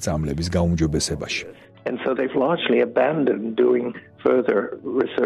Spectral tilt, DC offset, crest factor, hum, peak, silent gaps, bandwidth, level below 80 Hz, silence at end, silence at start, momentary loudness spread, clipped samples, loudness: -5.5 dB/octave; under 0.1%; 14 dB; none; -6 dBFS; none; 13 kHz; -42 dBFS; 0 s; 0 s; 8 LU; under 0.1%; -22 LUFS